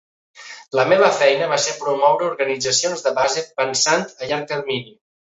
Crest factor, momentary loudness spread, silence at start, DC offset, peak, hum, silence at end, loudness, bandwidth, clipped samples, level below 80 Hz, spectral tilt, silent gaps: 18 dB; 10 LU; 0.35 s; under 0.1%; 0 dBFS; none; 0.35 s; -18 LUFS; 8.2 kHz; under 0.1%; -64 dBFS; -2 dB/octave; none